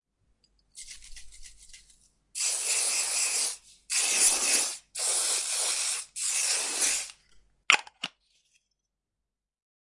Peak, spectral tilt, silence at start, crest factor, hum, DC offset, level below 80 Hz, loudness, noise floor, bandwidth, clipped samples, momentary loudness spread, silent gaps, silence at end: -2 dBFS; 3 dB/octave; 0.75 s; 30 dB; none; under 0.1%; -62 dBFS; -25 LUFS; -87 dBFS; 11.5 kHz; under 0.1%; 19 LU; none; 1.9 s